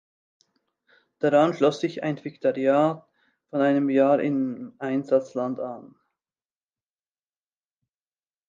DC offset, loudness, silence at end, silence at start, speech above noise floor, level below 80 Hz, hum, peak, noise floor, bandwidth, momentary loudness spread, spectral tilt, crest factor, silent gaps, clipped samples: under 0.1%; -24 LUFS; 2.6 s; 1.2 s; over 67 dB; -80 dBFS; none; -6 dBFS; under -90 dBFS; 7.6 kHz; 12 LU; -7 dB/octave; 20 dB; none; under 0.1%